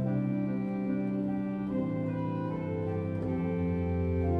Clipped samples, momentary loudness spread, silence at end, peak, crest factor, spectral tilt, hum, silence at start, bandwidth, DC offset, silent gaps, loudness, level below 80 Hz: under 0.1%; 3 LU; 0 s; -20 dBFS; 12 dB; -11 dB/octave; none; 0 s; 4.9 kHz; under 0.1%; none; -32 LUFS; -48 dBFS